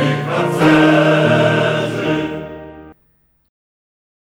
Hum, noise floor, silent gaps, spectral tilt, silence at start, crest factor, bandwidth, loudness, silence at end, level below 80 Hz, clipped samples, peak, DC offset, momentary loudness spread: none; -59 dBFS; none; -6.5 dB/octave; 0 s; 16 dB; 13.5 kHz; -14 LUFS; 1.45 s; -50 dBFS; under 0.1%; 0 dBFS; under 0.1%; 16 LU